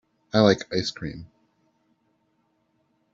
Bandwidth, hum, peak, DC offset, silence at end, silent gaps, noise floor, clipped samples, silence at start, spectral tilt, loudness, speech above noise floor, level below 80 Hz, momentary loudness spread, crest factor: 7.8 kHz; none; -4 dBFS; under 0.1%; 1.9 s; none; -70 dBFS; under 0.1%; 0.35 s; -4.5 dB/octave; -23 LUFS; 47 dB; -58 dBFS; 17 LU; 24 dB